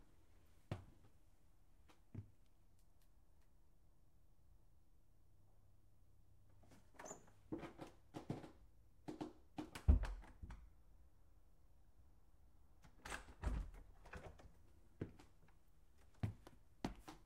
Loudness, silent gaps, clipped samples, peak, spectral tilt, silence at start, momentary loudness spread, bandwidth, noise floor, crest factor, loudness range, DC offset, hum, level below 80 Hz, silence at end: -50 LUFS; none; under 0.1%; -22 dBFS; -6.5 dB/octave; 0 s; 22 LU; 14 kHz; -73 dBFS; 30 dB; 20 LU; under 0.1%; none; -52 dBFS; 0 s